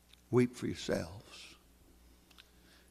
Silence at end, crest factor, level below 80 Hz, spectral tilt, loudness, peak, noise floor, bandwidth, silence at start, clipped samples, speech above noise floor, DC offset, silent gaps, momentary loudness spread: 1.35 s; 22 dB; -62 dBFS; -6 dB/octave; -35 LUFS; -16 dBFS; -63 dBFS; 14.5 kHz; 0.3 s; under 0.1%; 28 dB; under 0.1%; none; 20 LU